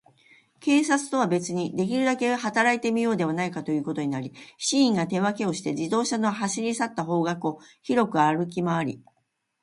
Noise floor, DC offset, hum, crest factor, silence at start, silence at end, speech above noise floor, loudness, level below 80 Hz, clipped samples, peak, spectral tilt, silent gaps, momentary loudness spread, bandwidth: -74 dBFS; under 0.1%; none; 18 dB; 0.6 s; 0.65 s; 50 dB; -25 LUFS; -70 dBFS; under 0.1%; -6 dBFS; -4.5 dB/octave; none; 8 LU; 11.5 kHz